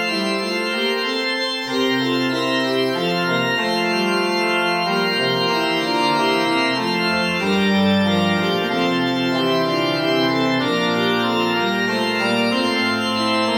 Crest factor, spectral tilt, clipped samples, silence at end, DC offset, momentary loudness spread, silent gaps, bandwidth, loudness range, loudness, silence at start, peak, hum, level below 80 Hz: 14 dB; -4.5 dB/octave; under 0.1%; 0 s; under 0.1%; 2 LU; none; over 20 kHz; 1 LU; -18 LUFS; 0 s; -6 dBFS; none; -60 dBFS